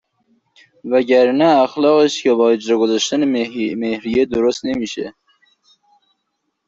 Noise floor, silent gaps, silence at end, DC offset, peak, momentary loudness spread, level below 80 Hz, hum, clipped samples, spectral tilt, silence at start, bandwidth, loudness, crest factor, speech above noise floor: -72 dBFS; none; 1.6 s; under 0.1%; -2 dBFS; 9 LU; -56 dBFS; none; under 0.1%; -4.5 dB/octave; 0.85 s; 7.8 kHz; -16 LUFS; 14 dB; 57 dB